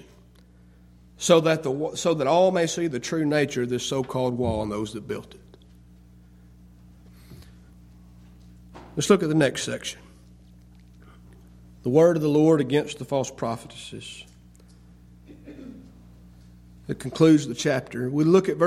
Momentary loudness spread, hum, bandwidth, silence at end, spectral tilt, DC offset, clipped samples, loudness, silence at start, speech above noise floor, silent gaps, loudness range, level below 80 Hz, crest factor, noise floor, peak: 19 LU; 60 Hz at -50 dBFS; 14.5 kHz; 0 s; -5.5 dB/octave; under 0.1%; under 0.1%; -23 LUFS; 1.2 s; 30 dB; none; 15 LU; -54 dBFS; 22 dB; -53 dBFS; -4 dBFS